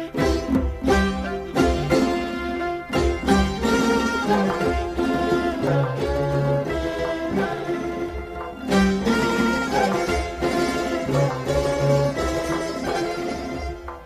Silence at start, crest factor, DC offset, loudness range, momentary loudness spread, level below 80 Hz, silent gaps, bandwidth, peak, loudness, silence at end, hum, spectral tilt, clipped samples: 0 s; 18 dB; under 0.1%; 2 LU; 7 LU; -34 dBFS; none; 15.5 kHz; -4 dBFS; -23 LUFS; 0 s; none; -6 dB/octave; under 0.1%